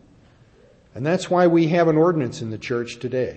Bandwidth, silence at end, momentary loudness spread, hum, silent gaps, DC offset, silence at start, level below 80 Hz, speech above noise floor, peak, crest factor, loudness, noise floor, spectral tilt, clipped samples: 8.6 kHz; 0 s; 11 LU; none; none; under 0.1%; 0.95 s; -58 dBFS; 33 dB; -6 dBFS; 16 dB; -20 LUFS; -53 dBFS; -7 dB/octave; under 0.1%